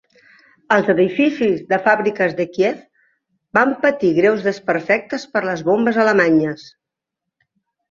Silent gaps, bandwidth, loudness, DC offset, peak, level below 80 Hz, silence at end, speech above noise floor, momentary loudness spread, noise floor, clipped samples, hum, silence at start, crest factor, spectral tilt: none; 7.4 kHz; -17 LUFS; under 0.1%; -2 dBFS; -62 dBFS; 1.3 s; 65 dB; 7 LU; -82 dBFS; under 0.1%; none; 0.7 s; 16 dB; -6.5 dB/octave